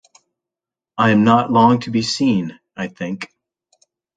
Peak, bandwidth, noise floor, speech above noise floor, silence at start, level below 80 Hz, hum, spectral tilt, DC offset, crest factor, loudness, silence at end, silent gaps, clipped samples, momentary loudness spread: 0 dBFS; 9.2 kHz; -88 dBFS; 72 dB; 0.95 s; -58 dBFS; none; -6 dB/octave; under 0.1%; 18 dB; -16 LUFS; 0.9 s; none; under 0.1%; 17 LU